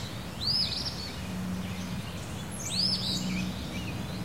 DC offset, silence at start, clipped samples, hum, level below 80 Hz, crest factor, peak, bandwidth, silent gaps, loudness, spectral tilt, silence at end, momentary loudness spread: 0.4%; 0 s; under 0.1%; none; -48 dBFS; 16 dB; -16 dBFS; 16 kHz; none; -31 LUFS; -4 dB/octave; 0 s; 11 LU